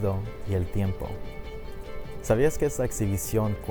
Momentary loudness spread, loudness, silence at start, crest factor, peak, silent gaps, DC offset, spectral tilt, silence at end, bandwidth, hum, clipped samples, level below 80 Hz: 16 LU; -28 LUFS; 0 s; 18 dB; -10 dBFS; none; under 0.1%; -6.5 dB/octave; 0 s; over 20 kHz; none; under 0.1%; -40 dBFS